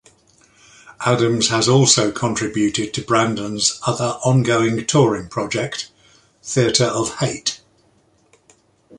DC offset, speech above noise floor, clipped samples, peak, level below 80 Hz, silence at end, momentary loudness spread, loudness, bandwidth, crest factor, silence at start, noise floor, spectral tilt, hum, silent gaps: under 0.1%; 40 dB; under 0.1%; 0 dBFS; -52 dBFS; 0 s; 10 LU; -18 LUFS; 11.5 kHz; 18 dB; 0.85 s; -58 dBFS; -4 dB/octave; none; none